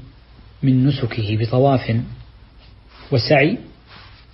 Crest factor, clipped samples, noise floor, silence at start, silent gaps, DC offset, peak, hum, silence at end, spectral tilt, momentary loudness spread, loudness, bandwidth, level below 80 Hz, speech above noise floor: 18 dB; under 0.1%; -45 dBFS; 0 s; none; under 0.1%; -2 dBFS; none; 0.3 s; -10.5 dB/octave; 11 LU; -18 LUFS; 5.8 kHz; -44 dBFS; 28 dB